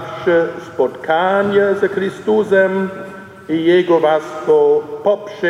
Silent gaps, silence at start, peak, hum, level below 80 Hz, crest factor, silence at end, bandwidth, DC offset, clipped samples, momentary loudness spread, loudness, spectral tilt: none; 0 s; -2 dBFS; none; -64 dBFS; 14 dB; 0 s; 11 kHz; under 0.1%; under 0.1%; 10 LU; -15 LUFS; -6.5 dB/octave